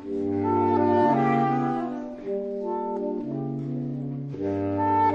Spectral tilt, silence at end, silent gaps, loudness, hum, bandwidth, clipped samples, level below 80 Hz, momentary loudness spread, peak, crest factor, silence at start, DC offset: -9.5 dB/octave; 0 s; none; -26 LUFS; none; 7 kHz; under 0.1%; -60 dBFS; 11 LU; -8 dBFS; 16 dB; 0 s; under 0.1%